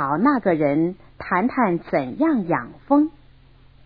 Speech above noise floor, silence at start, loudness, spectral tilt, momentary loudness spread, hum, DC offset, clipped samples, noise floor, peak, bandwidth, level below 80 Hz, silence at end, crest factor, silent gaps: 30 dB; 0 s; -21 LUFS; -11 dB/octave; 7 LU; none; under 0.1%; under 0.1%; -50 dBFS; -4 dBFS; 5 kHz; -54 dBFS; 0.75 s; 18 dB; none